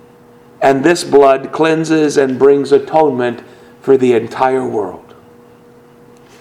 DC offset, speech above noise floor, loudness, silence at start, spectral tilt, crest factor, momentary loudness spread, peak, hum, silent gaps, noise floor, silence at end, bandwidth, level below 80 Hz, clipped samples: under 0.1%; 31 dB; -12 LUFS; 0.6 s; -5.5 dB/octave; 14 dB; 10 LU; 0 dBFS; none; none; -42 dBFS; 1.4 s; 12.5 kHz; -54 dBFS; 0.2%